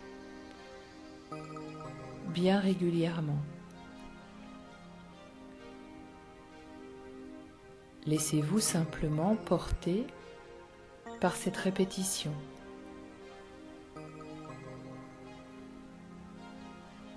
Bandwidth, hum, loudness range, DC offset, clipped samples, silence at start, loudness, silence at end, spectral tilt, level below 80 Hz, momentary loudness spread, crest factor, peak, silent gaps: 11 kHz; none; 18 LU; under 0.1%; under 0.1%; 0 s; -34 LUFS; 0 s; -5 dB/octave; -54 dBFS; 21 LU; 22 dB; -16 dBFS; none